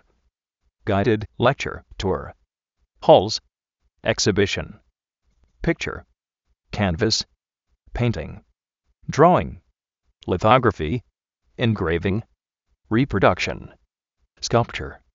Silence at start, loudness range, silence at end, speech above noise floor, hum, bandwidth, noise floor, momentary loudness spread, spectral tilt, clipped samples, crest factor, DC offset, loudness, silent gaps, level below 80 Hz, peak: 0.85 s; 5 LU; 0.2 s; 52 dB; none; 7.6 kHz; -73 dBFS; 18 LU; -4.5 dB/octave; under 0.1%; 22 dB; under 0.1%; -21 LUFS; none; -44 dBFS; 0 dBFS